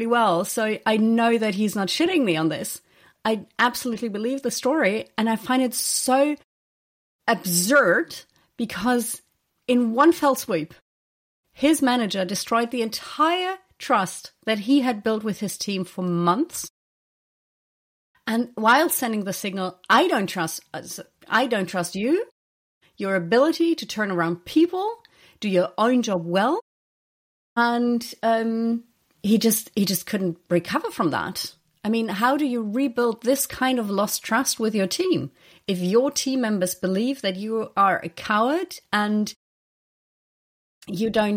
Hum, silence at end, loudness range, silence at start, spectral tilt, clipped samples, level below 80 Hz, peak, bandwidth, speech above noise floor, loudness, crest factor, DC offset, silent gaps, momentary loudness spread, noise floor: none; 0 s; 3 LU; 0 s; -4 dB/octave; under 0.1%; -66 dBFS; -6 dBFS; 16.5 kHz; over 68 dB; -23 LUFS; 16 dB; under 0.1%; 6.44-7.19 s, 10.81-11.43 s, 16.70-18.14 s, 22.31-22.81 s, 26.62-27.56 s, 39.36-40.81 s; 11 LU; under -90 dBFS